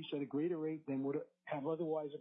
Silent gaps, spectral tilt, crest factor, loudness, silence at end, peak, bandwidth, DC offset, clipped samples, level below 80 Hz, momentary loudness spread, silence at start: none; -6 dB/octave; 12 dB; -41 LUFS; 0 s; -28 dBFS; 3.9 kHz; under 0.1%; under 0.1%; under -90 dBFS; 4 LU; 0 s